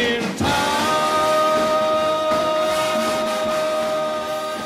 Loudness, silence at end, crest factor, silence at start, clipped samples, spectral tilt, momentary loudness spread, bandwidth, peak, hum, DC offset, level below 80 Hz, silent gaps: -19 LUFS; 0 s; 14 dB; 0 s; under 0.1%; -3.5 dB/octave; 5 LU; 16 kHz; -6 dBFS; none; under 0.1%; -50 dBFS; none